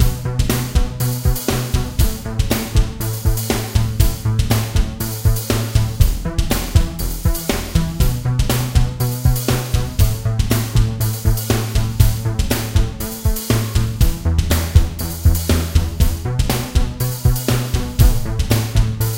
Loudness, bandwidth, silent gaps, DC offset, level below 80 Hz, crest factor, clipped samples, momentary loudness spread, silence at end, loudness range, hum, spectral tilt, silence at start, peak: -19 LUFS; 17 kHz; none; under 0.1%; -20 dBFS; 16 dB; under 0.1%; 4 LU; 0 s; 1 LU; none; -5 dB/octave; 0 s; 0 dBFS